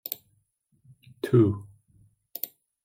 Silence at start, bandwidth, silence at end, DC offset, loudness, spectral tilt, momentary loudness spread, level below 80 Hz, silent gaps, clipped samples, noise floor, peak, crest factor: 0.1 s; 16.5 kHz; 0.4 s; under 0.1%; -27 LUFS; -8 dB/octave; 16 LU; -68 dBFS; none; under 0.1%; -71 dBFS; -10 dBFS; 20 dB